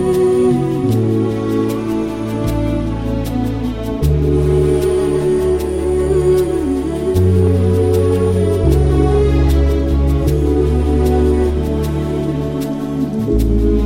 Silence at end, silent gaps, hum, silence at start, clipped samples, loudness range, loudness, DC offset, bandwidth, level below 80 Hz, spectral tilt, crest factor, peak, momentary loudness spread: 0 s; none; none; 0 s; under 0.1%; 4 LU; -15 LUFS; 0.7%; 16 kHz; -20 dBFS; -8 dB/octave; 12 dB; -2 dBFS; 6 LU